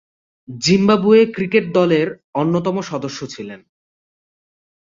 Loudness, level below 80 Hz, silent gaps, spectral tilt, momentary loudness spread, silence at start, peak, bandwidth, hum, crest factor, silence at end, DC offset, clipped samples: -16 LUFS; -58 dBFS; 2.24-2.33 s; -5.5 dB/octave; 17 LU; 0.5 s; -2 dBFS; 7.6 kHz; none; 16 dB; 1.4 s; under 0.1%; under 0.1%